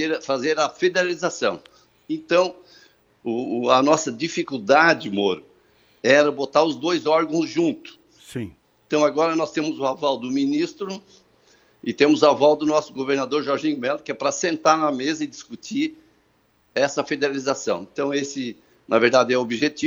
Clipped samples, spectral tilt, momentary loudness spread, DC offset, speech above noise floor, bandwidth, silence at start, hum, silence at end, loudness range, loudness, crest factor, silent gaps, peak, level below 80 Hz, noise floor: under 0.1%; -4 dB/octave; 15 LU; under 0.1%; 42 dB; over 20 kHz; 0 s; none; 0 s; 4 LU; -21 LUFS; 20 dB; none; -2 dBFS; -68 dBFS; -63 dBFS